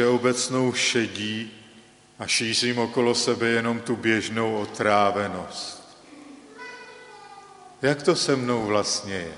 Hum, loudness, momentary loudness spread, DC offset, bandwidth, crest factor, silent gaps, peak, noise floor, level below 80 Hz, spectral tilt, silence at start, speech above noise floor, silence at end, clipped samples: 50 Hz at -65 dBFS; -24 LUFS; 19 LU; under 0.1%; 11.5 kHz; 20 dB; none; -6 dBFS; -52 dBFS; -64 dBFS; -3.5 dB/octave; 0 s; 28 dB; 0 s; under 0.1%